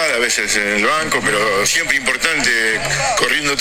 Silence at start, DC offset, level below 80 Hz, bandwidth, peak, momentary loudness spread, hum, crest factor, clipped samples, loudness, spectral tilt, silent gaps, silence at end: 0 s; under 0.1%; -42 dBFS; 18 kHz; 0 dBFS; 2 LU; none; 16 dB; under 0.1%; -15 LUFS; -1.5 dB/octave; none; 0 s